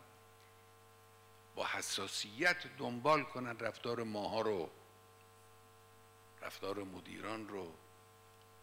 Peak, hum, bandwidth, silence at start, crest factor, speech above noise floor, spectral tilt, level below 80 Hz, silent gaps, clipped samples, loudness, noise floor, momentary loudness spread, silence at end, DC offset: -18 dBFS; 50 Hz at -70 dBFS; 16 kHz; 0 s; 24 dB; 23 dB; -3.5 dB/octave; -80 dBFS; none; under 0.1%; -39 LUFS; -63 dBFS; 16 LU; 0 s; under 0.1%